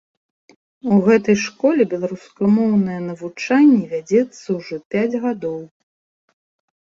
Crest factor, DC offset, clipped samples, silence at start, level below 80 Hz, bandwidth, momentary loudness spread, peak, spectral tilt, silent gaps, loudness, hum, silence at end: 16 dB; under 0.1%; under 0.1%; 0.85 s; -60 dBFS; 7.4 kHz; 13 LU; -2 dBFS; -7 dB/octave; 4.85-4.91 s; -18 LUFS; none; 1.15 s